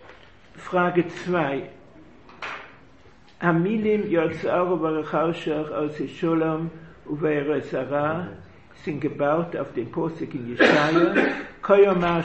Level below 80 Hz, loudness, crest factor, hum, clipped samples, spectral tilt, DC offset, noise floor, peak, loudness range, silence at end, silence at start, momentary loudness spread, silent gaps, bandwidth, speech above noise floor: -56 dBFS; -23 LUFS; 20 dB; none; under 0.1%; -7 dB/octave; 0.2%; -53 dBFS; -4 dBFS; 4 LU; 0 s; 0.1 s; 16 LU; none; 8.4 kHz; 30 dB